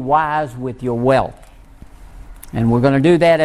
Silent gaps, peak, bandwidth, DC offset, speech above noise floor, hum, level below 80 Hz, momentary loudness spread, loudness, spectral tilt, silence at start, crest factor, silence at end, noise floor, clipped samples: none; -2 dBFS; 14 kHz; under 0.1%; 26 dB; none; -40 dBFS; 13 LU; -16 LUFS; -7.5 dB/octave; 0 s; 16 dB; 0 s; -40 dBFS; under 0.1%